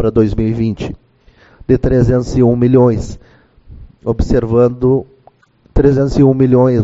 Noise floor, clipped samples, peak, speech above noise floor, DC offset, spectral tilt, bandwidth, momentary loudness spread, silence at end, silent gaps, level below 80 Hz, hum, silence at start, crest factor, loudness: -49 dBFS; under 0.1%; 0 dBFS; 37 dB; under 0.1%; -9.5 dB/octave; 8 kHz; 11 LU; 0 s; none; -26 dBFS; none; 0 s; 12 dB; -13 LUFS